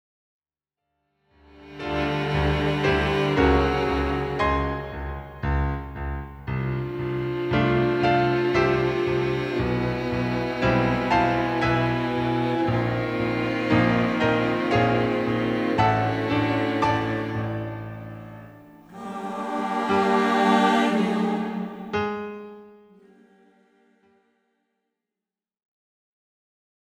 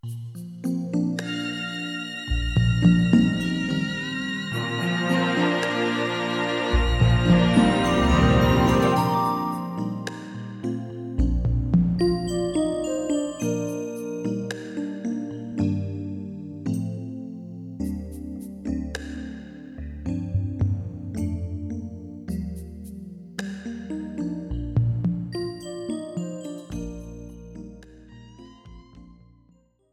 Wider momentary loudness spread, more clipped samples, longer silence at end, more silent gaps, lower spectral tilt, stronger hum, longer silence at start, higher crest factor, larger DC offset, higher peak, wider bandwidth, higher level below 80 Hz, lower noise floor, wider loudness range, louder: second, 13 LU vs 17 LU; neither; first, 4.3 s vs 0.8 s; neither; about the same, -7 dB/octave vs -6.5 dB/octave; neither; first, 1.55 s vs 0.05 s; about the same, 18 dB vs 20 dB; neither; about the same, -6 dBFS vs -6 dBFS; about the same, 16 kHz vs 15 kHz; about the same, -38 dBFS vs -36 dBFS; first, -90 dBFS vs -60 dBFS; second, 6 LU vs 13 LU; about the same, -24 LUFS vs -25 LUFS